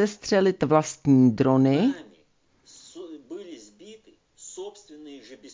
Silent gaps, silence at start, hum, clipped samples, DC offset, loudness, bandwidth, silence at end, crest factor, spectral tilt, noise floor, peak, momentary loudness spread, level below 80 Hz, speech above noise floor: none; 0 s; none; under 0.1%; under 0.1%; -21 LUFS; 7.6 kHz; 0.05 s; 18 dB; -6.5 dB/octave; -63 dBFS; -6 dBFS; 25 LU; -62 dBFS; 43 dB